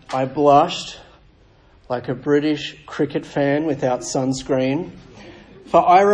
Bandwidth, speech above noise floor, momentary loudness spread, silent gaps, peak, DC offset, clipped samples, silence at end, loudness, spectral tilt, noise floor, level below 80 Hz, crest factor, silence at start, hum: 10 kHz; 33 dB; 14 LU; none; -2 dBFS; under 0.1%; under 0.1%; 0 s; -19 LUFS; -5.5 dB/octave; -52 dBFS; -52 dBFS; 18 dB; 0.1 s; none